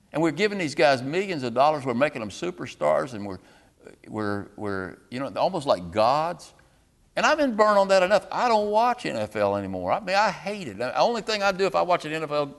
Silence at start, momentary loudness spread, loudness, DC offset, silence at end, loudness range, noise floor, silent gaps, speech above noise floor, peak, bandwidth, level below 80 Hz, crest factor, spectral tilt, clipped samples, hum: 0.15 s; 12 LU; -24 LUFS; under 0.1%; 0.05 s; 7 LU; -61 dBFS; none; 37 dB; -6 dBFS; 12.5 kHz; -58 dBFS; 20 dB; -5 dB/octave; under 0.1%; none